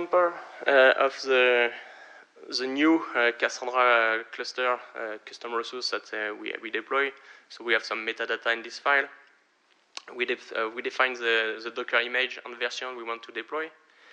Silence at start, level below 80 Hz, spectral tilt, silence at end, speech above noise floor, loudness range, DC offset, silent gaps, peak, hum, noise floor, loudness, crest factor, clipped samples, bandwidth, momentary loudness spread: 0 s; under -90 dBFS; -2 dB/octave; 0.45 s; 39 dB; 6 LU; under 0.1%; none; -8 dBFS; none; -66 dBFS; -26 LUFS; 20 dB; under 0.1%; 9.4 kHz; 15 LU